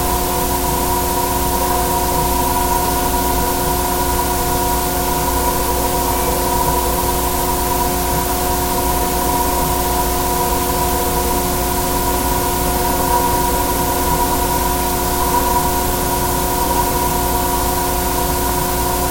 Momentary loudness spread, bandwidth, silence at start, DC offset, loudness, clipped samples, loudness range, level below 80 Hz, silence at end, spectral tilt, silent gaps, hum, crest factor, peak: 1 LU; 17 kHz; 0 s; under 0.1%; -16 LUFS; under 0.1%; 0 LU; -24 dBFS; 0 s; -3.5 dB/octave; none; none; 14 dB; -2 dBFS